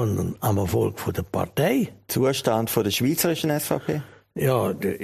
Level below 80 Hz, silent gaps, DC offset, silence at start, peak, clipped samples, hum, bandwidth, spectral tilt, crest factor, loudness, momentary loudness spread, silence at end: -50 dBFS; none; under 0.1%; 0 s; -4 dBFS; under 0.1%; none; 15.5 kHz; -5.5 dB/octave; 18 dB; -24 LUFS; 6 LU; 0 s